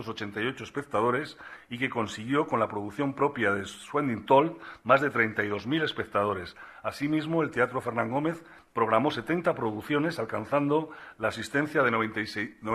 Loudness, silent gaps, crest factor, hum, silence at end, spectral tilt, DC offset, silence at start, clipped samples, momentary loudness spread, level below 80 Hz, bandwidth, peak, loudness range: -28 LUFS; none; 22 dB; none; 0 s; -6 dB/octave; under 0.1%; 0 s; under 0.1%; 11 LU; -64 dBFS; 14 kHz; -8 dBFS; 3 LU